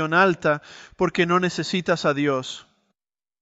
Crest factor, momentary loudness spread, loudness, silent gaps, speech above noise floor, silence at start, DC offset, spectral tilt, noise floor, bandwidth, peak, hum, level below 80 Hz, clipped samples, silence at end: 18 dB; 9 LU; -22 LUFS; none; 64 dB; 0 s; under 0.1%; -5.5 dB/octave; -87 dBFS; 8.2 kHz; -6 dBFS; none; -60 dBFS; under 0.1%; 0.8 s